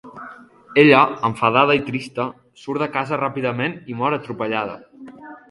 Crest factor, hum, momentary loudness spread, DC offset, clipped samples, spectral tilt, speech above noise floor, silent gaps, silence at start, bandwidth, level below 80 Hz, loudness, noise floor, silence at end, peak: 20 dB; none; 24 LU; under 0.1%; under 0.1%; -6.5 dB/octave; 22 dB; none; 0.05 s; 11.5 kHz; -60 dBFS; -19 LUFS; -41 dBFS; 0.15 s; 0 dBFS